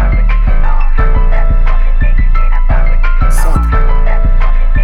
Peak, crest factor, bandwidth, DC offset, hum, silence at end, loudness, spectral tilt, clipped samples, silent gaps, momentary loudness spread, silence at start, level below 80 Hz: -2 dBFS; 4 dB; 11 kHz; under 0.1%; none; 0 s; -14 LUFS; -6.5 dB/octave; under 0.1%; none; 2 LU; 0 s; -6 dBFS